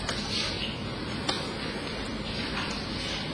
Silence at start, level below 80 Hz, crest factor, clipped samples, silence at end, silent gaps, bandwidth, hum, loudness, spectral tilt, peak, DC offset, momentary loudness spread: 0 s; -46 dBFS; 22 dB; under 0.1%; 0 s; none; 11 kHz; none; -31 LUFS; -4 dB/octave; -10 dBFS; under 0.1%; 5 LU